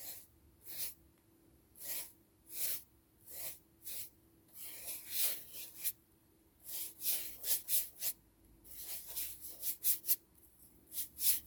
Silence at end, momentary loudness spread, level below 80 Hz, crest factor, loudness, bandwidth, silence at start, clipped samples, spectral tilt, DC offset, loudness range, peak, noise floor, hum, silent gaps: 0 s; 17 LU; -74 dBFS; 26 dB; -37 LUFS; over 20 kHz; 0 s; under 0.1%; 1 dB/octave; under 0.1%; 7 LU; -16 dBFS; -69 dBFS; none; none